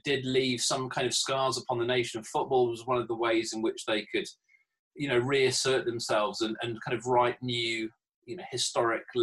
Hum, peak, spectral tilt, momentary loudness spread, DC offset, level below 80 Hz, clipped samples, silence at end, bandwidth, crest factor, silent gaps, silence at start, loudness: none; -14 dBFS; -3.5 dB/octave; 8 LU; under 0.1%; -68 dBFS; under 0.1%; 0 s; 12.5 kHz; 16 dB; 4.79-4.91 s, 8.14-8.22 s; 0.05 s; -29 LUFS